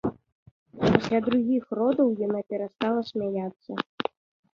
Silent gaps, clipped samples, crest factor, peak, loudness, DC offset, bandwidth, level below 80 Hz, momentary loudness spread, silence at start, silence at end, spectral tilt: 0.32-0.66 s, 3.56-3.60 s, 3.86-3.98 s; under 0.1%; 24 dB; -4 dBFS; -27 LUFS; under 0.1%; 7.2 kHz; -56 dBFS; 11 LU; 0.05 s; 0.55 s; -7.5 dB/octave